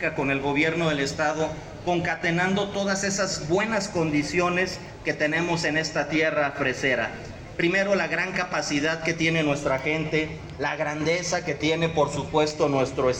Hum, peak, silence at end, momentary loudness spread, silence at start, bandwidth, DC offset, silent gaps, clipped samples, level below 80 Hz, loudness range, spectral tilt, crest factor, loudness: none; -10 dBFS; 0 s; 5 LU; 0 s; 12 kHz; under 0.1%; none; under 0.1%; -50 dBFS; 1 LU; -4.5 dB/octave; 16 dB; -25 LUFS